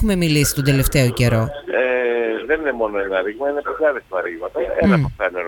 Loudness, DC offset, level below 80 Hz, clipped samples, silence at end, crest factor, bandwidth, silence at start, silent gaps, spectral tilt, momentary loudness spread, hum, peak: -19 LUFS; under 0.1%; -34 dBFS; under 0.1%; 0 s; 16 dB; 19 kHz; 0 s; none; -5.5 dB/octave; 7 LU; none; -2 dBFS